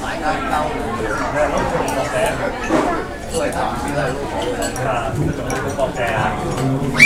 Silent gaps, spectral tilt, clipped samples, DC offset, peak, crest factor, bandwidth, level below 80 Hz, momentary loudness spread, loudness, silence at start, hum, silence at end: none; -5 dB/octave; under 0.1%; under 0.1%; 0 dBFS; 18 dB; 16 kHz; -32 dBFS; 4 LU; -20 LUFS; 0 s; none; 0 s